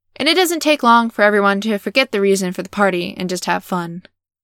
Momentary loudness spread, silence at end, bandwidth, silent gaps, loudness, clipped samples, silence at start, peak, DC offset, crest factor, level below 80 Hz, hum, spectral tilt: 11 LU; 0.45 s; 18.5 kHz; none; -16 LUFS; under 0.1%; 0.2 s; 0 dBFS; under 0.1%; 16 dB; -62 dBFS; none; -4 dB/octave